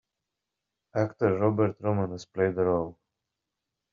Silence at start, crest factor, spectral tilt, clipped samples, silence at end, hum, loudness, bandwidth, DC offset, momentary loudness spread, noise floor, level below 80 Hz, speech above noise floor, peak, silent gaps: 0.95 s; 20 dB; -8 dB/octave; under 0.1%; 1 s; none; -28 LUFS; 7.4 kHz; under 0.1%; 8 LU; -86 dBFS; -66 dBFS; 59 dB; -10 dBFS; none